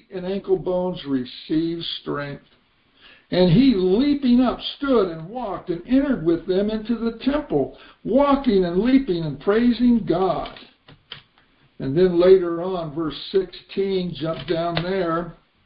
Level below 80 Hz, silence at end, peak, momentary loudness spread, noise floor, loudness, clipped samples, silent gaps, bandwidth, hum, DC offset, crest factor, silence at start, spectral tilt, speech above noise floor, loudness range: -46 dBFS; 0.35 s; -4 dBFS; 12 LU; -59 dBFS; -21 LUFS; under 0.1%; none; 5.2 kHz; none; under 0.1%; 18 dB; 0.1 s; -11.5 dB/octave; 38 dB; 3 LU